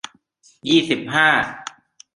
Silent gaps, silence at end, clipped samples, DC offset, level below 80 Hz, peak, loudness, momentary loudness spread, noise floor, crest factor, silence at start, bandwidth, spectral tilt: none; 0.45 s; under 0.1%; under 0.1%; -60 dBFS; -2 dBFS; -18 LUFS; 21 LU; -57 dBFS; 20 dB; 0.65 s; 11.5 kHz; -4 dB/octave